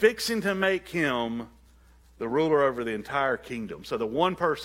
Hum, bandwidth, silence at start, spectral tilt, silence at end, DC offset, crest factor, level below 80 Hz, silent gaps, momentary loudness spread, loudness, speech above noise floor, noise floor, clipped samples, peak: none; 16.5 kHz; 0 s; -4.5 dB/octave; 0 s; under 0.1%; 20 dB; -56 dBFS; none; 12 LU; -27 LUFS; 29 dB; -56 dBFS; under 0.1%; -6 dBFS